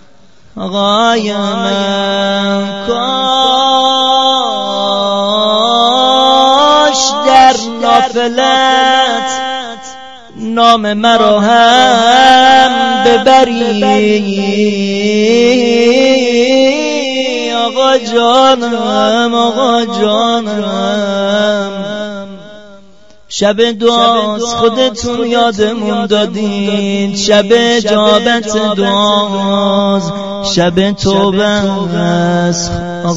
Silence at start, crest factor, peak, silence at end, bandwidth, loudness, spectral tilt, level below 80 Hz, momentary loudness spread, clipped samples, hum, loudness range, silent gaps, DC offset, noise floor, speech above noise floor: 0.55 s; 10 dB; 0 dBFS; 0 s; 9 kHz; -10 LUFS; -4 dB/octave; -44 dBFS; 8 LU; 0.4%; none; 5 LU; none; 1%; -45 dBFS; 36 dB